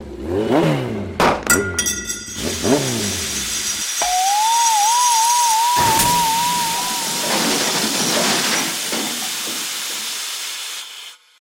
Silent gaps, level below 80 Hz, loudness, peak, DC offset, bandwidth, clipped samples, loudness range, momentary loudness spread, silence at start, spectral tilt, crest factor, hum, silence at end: none; -46 dBFS; -17 LUFS; -2 dBFS; under 0.1%; 17 kHz; under 0.1%; 4 LU; 10 LU; 0 s; -2 dB/octave; 16 dB; none; 0.3 s